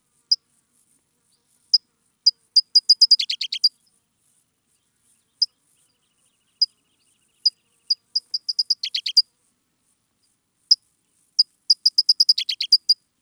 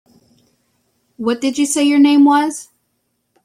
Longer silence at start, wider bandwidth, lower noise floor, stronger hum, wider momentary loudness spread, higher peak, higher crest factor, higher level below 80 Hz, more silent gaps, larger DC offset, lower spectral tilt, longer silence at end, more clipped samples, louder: second, 0.3 s vs 1.2 s; first, 16 kHz vs 14 kHz; about the same, -69 dBFS vs -68 dBFS; neither; second, 9 LU vs 13 LU; about the same, -4 dBFS vs -2 dBFS; first, 20 dB vs 14 dB; second, -88 dBFS vs -66 dBFS; neither; neither; second, 6 dB/octave vs -2.5 dB/octave; second, 0.3 s vs 0.8 s; neither; second, -18 LUFS vs -14 LUFS